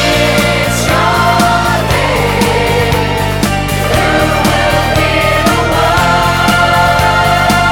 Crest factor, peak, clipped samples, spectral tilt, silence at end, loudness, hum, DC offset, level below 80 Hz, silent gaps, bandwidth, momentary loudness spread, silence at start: 10 dB; 0 dBFS; under 0.1%; -4.5 dB/octave; 0 s; -10 LUFS; none; under 0.1%; -24 dBFS; none; 19 kHz; 3 LU; 0 s